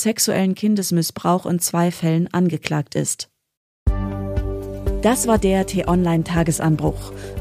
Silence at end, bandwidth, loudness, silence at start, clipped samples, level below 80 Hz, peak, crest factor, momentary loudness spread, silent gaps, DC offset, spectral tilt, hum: 0 s; 15.5 kHz; -20 LUFS; 0 s; under 0.1%; -32 dBFS; -4 dBFS; 16 dB; 9 LU; 3.57-3.86 s; under 0.1%; -5 dB/octave; none